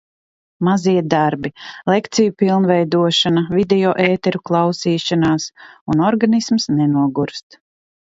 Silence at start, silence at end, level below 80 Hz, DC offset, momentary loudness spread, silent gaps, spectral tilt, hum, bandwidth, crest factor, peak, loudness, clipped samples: 0.6 s; 0.7 s; -54 dBFS; under 0.1%; 8 LU; 5.81-5.86 s; -5.5 dB/octave; none; 8 kHz; 16 dB; 0 dBFS; -16 LUFS; under 0.1%